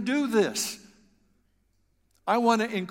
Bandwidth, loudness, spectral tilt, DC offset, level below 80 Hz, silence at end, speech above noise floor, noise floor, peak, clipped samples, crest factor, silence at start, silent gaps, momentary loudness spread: 16.5 kHz; -26 LUFS; -3.5 dB/octave; under 0.1%; -70 dBFS; 0 s; 45 dB; -70 dBFS; -10 dBFS; under 0.1%; 18 dB; 0 s; none; 12 LU